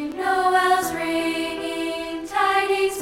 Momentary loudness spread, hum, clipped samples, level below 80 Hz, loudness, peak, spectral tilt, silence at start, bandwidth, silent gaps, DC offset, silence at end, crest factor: 8 LU; none; under 0.1%; -54 dBFS; -22 LUFS; -8 dBFS; -2.5 dB/octave; 0 s; 17 kHz; none; under 0.1%; 0 s; 14 dB